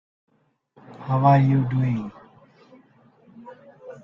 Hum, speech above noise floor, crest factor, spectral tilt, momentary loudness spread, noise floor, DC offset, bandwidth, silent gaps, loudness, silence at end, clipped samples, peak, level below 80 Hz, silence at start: none; 43 dB; 20 dB; -10.5 dB/octave; 27 LU; -62 dBFS; under 0.1%; 5.8 kHz; none; -20 LUFS; 0.1 s; under 0.1%; -6 dBFS; -60 dBFS; 0.9 s